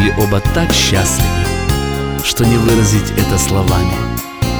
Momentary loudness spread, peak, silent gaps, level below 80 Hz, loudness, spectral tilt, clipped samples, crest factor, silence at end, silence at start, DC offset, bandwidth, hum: 6 LU; 0 dBFS; none; -22 dBFS; -14 LUFS; -4.5 dB/octave; under 0.1%; 12 dB; 0 s; 0 s; under 0.1%; over 20 kHz; none